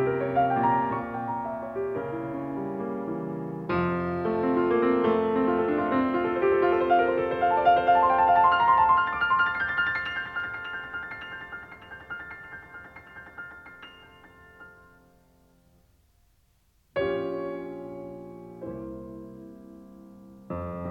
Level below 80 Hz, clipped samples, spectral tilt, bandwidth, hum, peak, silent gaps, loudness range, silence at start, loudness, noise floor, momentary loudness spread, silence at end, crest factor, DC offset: -58 dBFS; under 0.1%; -8 dB/octave; 6.2 kHz; none; -10 dBFS; none; 20 LU; 0 s; -25 LUFS; -65 dBFS; 22 LU; 0 s; 18 dB; under 0.1%